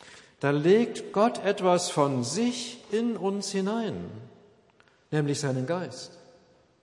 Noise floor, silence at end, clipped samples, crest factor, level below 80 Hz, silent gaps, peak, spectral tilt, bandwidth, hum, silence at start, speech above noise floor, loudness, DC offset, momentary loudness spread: -62 dBFS; 0.65 s; under 0.1%; 18 dB; -76 dBFS; none; -10 dBFS; -5 dB/octave; 11.5 kHz; none; 0.05 s; 35 dB; -27 LUFS; under 0.1%; 14 LU